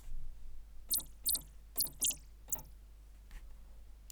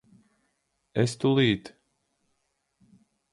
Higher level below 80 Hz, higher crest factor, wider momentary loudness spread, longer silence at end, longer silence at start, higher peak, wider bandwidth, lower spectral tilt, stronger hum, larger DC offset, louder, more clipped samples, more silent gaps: first, -50 dBFS vs -60 dBFS; about the same, 18 dB vs 20 dB; first, 24 LU vs 9 LU; second, 0 s vs 1.65 s; second, 0 s vs 0.95 s; second, -22 dBFS vs -10 dBFS; first, over 20 kHz vs 11.5 kHz; second, 0 dB/octave vs -6 dB/octave; first, 50 Hz at -55 dBFS vs none; neither; second, -36 LUFS vs -26 LUFS; neither; neither